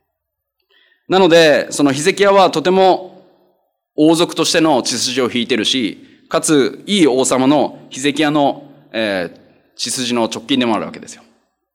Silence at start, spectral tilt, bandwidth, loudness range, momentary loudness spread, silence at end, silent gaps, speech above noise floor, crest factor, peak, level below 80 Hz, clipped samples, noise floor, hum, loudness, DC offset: 1.1 s; -3.5 dB/octave; 17 kHz; 5 LU; 11 LU; 0.6 s; none; 62 dB; 14 dB; -2 dBFS; -62 dBFS; under 0.1%; -76 dBFS; none; -14 LUFS; under 0.1%